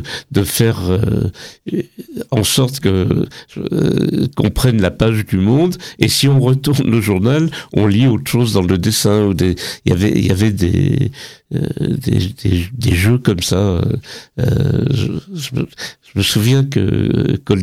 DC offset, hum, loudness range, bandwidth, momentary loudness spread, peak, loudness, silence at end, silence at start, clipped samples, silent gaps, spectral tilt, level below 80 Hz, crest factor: under 0.1%; none; 3 LU; 16.5 kHz; 10 LU; 0 dBFS; -15 LUFS; 0 s; 0 s; under 0.1%; none; -6 dB/octave; -38 dBFS; 14 dB